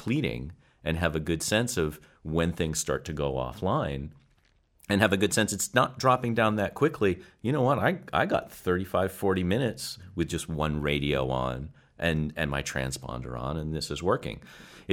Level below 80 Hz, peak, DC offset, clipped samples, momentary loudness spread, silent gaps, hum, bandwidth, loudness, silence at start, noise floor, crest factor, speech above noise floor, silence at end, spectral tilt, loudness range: -46 dBFS; -6 dBFS; under 0.1%; under 0.1%; 11 LU; none; none; 17 kHz; -28 LUFS; 0 s; -66 dBFS; 22 dB; 37 dB; 0 s; -5 dB/octave; 5 LU